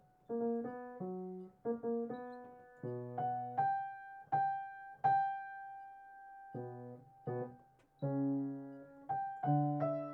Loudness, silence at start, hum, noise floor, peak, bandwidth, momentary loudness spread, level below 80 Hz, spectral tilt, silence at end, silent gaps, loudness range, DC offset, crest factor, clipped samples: -40 LUFS; 0.3 s; none; -64 dBFS; -22 dBFS; 4.2 kHz; 17 LU; -82 dBFS; -10.5 dB/octave; 0 s; none; 5 LU; under 0.1%; 18 dB; under 0.1%